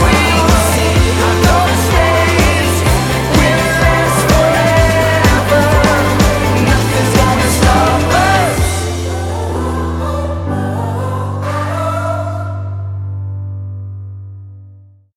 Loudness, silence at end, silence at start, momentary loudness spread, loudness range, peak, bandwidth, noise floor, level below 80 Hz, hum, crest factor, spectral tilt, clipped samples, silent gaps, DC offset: -12 LUFS; 0.4 s; 0 s; 12 LU; 9 LU; 0 dBFS; 17 kHz; -40 dBFS; -22 dBFS; none; 12 dB; -5 dB/octave; under 0.1%; none; under 0.1%